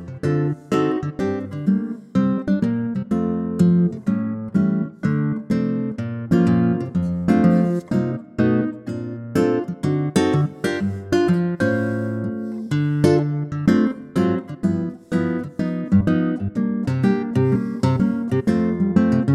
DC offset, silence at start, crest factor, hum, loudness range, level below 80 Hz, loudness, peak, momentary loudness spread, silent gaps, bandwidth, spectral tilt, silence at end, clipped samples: under 0.1%; 0 s; 16 dB; none; 2 LU; -50 dBFS; -21 LUFS; -4 dBFS; 7 LU; none; 12 kHz; -8 dB/octave; 0 s; under 0.1%